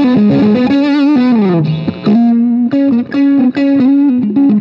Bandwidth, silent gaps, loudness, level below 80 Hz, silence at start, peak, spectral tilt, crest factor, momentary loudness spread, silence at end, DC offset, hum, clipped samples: 5.8 kHz; none; -10 LUFS; -50 dBFS; 0 s; -2 dBFS; -9 dB/octave; 8 dB; 3 LU; 0 s; under 0.1%; none; under 0.1%